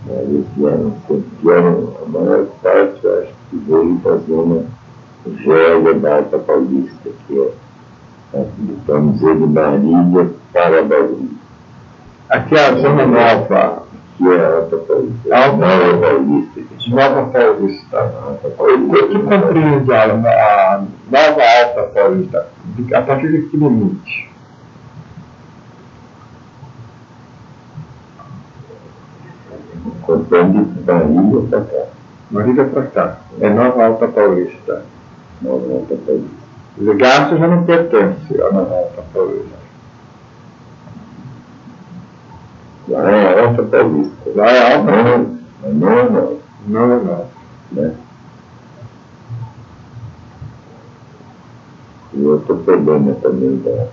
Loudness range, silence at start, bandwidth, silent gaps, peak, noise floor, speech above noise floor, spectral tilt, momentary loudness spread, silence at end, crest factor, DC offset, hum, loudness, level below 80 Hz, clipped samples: 9 LU; 0 s; 7.2 kHz; none; 0 dBFS; -40 dBFS; 28 dB; -7.5 dB/octave; 15 LU; 0 s; 14 dB; under 0.1%; none; -13 LUFS; -50 dBFS; under 0.1%